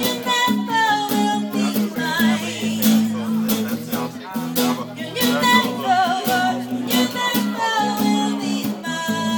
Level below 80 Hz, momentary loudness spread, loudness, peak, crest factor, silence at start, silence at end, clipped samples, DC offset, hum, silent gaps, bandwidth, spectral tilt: -62 dBFS; 8 LU; -20 LUFS; -2 dBFS; 18 dB; 0 s; 0 s; under 0.1%; under 0.1%; none; none; 20 kHz; -3.5 dB/octave